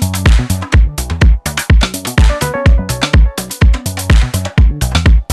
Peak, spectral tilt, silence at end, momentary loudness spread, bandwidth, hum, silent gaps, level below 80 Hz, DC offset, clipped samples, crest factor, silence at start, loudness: 0 dBFS; -5 dB/octave; 0 s; 3 LU; 13.5 kHz; none; none; -12 dBFS; under 0.1%; 0.4%; 10 dB; 0 s; -13 LUFS